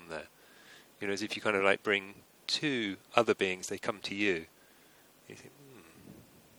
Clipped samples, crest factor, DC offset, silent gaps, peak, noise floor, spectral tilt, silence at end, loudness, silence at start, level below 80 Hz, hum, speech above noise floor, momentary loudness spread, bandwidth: under 0.1%; 28 dB; under 0.1%; none; -6 dBFS; -61 dBFS; -3.5 dB/octave; 0.4 s; -32 LUFS; 0 s; -74 dBFS; none; 29 dB; 24 LU; over 20 kHz